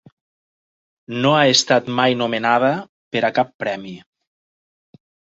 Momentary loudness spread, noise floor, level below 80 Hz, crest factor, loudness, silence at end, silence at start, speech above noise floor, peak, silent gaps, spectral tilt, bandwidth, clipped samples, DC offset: 14 LU; under -90 dBFS; -64 dBFS; 20 dB; -18 LUFS; 1.4 s; 1.1 s; over 72 dB; 0 dBFS; 2.89-3.11 s, 3.54-3.59 s; -3.5 dB/octave; 8.2 kHz; under 0.1%; under 0.1%